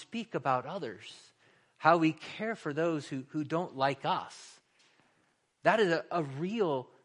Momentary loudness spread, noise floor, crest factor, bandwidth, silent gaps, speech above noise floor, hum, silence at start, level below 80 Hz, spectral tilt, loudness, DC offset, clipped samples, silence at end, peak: 13 LU; -73 dBFS; 24 dB; 11 kHz; none; 42 dB; none; 0 s; -80 dBFS; -6 dB/octave; -32 LUFS; under 0.1%; under 0.1%; 0.2 s; -10 dBFS